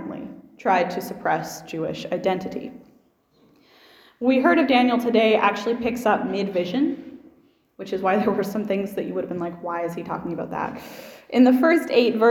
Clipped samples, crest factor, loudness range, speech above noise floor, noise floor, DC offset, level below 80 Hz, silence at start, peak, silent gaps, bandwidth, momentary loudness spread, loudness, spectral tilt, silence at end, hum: under 0.1%; 18 dB; 7 LU; 39 dB; -60 dBFS; under 0.1%; -62 dBFS; 0 s; -4 dBFS; none; 17 kHz; 17 LU; -22 LUFS; -5.5 dB/octave; 0 s; none